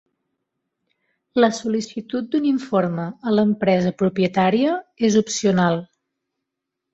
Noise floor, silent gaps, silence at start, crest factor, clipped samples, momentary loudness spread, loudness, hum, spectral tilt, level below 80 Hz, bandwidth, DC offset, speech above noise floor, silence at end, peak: -82 dBFS; none; 1.35 s; 16 dB; under 0.1%; 8 LU; -20 LUFS; none; -5.5 dB/octave; -60 dBFS; 8.2 kHz; under 0.1%; 62 dB; 1.1 s; -4 dBFS